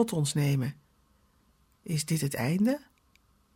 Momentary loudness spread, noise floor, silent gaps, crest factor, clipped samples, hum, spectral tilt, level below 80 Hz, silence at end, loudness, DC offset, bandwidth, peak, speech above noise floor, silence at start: 9 LU; -67 dBFS; none; 16 dB; under 0.1%; none; -5.5 dB/octave; -64 dBFS; 0.75 s; -29 LUFS; under 0.1%; 17 kHz; -14 dBFS; 38 dB; 0 s